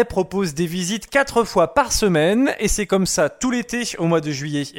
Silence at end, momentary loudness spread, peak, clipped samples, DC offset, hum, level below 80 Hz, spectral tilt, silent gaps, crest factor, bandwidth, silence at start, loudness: 0 s; 6 LU; -4 dBFS; under 0.1%; under 0.1%; none; -38 dBFS; -4 dB/octave; none; 16 dB; 17 kHz; 0 s; -19 LUFS